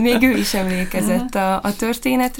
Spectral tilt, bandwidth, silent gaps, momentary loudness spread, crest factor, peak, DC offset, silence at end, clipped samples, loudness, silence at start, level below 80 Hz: -4.5 dB/octave; 17 kHz; none; 6 LU; 16 dB; -2 dBFS; under 0.1%; 0 s; under 0.1%; -19 LUFS; 0 s; -36 dBFS